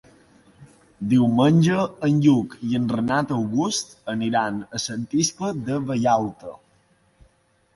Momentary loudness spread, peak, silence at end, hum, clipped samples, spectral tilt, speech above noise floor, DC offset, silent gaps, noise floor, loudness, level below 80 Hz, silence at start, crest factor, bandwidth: 11 LU; -6 dBFS; 1.2 s; none; under 0.1%; -5.5 dB/octave; 41 dB; under 0.1%; none; -62 dBFS; -22 LUFS; -58 dBFS; 0.6 s; 18 dB; 11.5 kHz